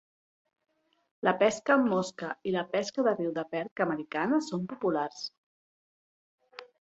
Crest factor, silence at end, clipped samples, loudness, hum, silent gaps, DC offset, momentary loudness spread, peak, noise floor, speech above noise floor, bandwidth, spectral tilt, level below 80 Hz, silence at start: 20 dB; 0.2 s; under 0.1%; -30 LUFS; none; 3.71-3.76 s, 5.38-6.38 s; under 0.1%; 11 LU; -12 dBFS; under -90 dBFS; over 61 dB; 8.2 kHz; -5 dB/octave; -76 dBFS; 1.25 s